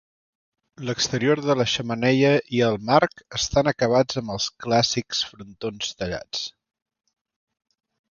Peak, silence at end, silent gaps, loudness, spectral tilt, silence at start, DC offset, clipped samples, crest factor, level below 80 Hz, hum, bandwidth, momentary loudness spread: -2 dBFS; 1.6 s; none; -22 LUFS; -4.5 dB/octave; 0.8 s; under 0.1%; under 0.1%; 22 dB; -52 dBFS; none; 7.4 kHz; 11 LU